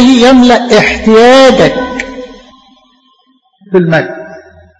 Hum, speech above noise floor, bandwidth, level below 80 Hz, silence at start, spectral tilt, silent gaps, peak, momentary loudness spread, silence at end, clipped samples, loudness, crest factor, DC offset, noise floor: none; 46 dB; 11 kHz; -34 dBFS; 0 s; -5 dB/octave; none; 0 dBFS; 18 LU; 0.4 s; 3%; -6 LUFS; 8 dB; under 0.1%; -51 dBFS